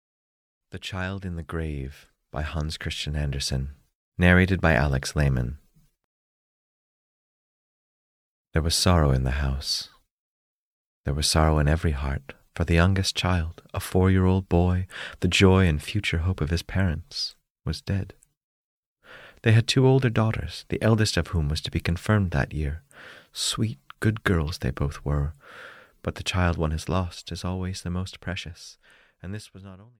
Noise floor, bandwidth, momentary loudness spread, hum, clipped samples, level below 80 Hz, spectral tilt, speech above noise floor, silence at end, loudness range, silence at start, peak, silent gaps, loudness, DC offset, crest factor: -49 dBFS; 15.5 kHz; 18 LU; none; under 0.1%; -36 dBFS; -5.5 dB/octave; 25 dB; 0.15 s; 8 LU; 0.75 s; -4 dBFS; 3.95-4.12 s, 6.04-8.45 s, 10.11-11.04 s, 17.50-17.55 s, 18.37-18.96 s; -25 LUFS; under 0.1%; 20 dB